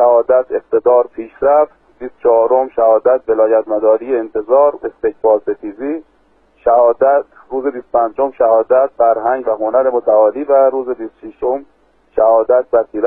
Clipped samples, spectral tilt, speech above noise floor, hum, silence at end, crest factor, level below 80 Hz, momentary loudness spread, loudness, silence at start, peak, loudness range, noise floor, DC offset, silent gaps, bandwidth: under 0.1%; -10 dB/octave; 41 dB; none; 0 s; 12 dB; -52 dBFS; 11 LU; -14 LUFS; 0 s; 0 dBFS; 2 LU; -53 dBFS; under 0.1%; none; 2.9 kHz